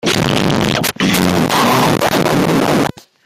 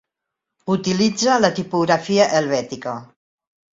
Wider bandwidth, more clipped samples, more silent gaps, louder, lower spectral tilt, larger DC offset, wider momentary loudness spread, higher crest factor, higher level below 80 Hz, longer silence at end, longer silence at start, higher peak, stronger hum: first, 16 kHz vs 7.8 kHz; neither; neither; first, -13 LUFS vs -19 LUFS; about the same, -4.5 dB/octave vs -4.5 dB/octave; neither; second, 3 LU vs 13 LU; second, 14 dB vs 20 dB; first, -40 dBFS vs -60 dBFS; second, 0.35 s vs 0.7 s; second, 0.05 s vs 0.65 s; about the same, 0 dBFS vs 0 dBFS; neither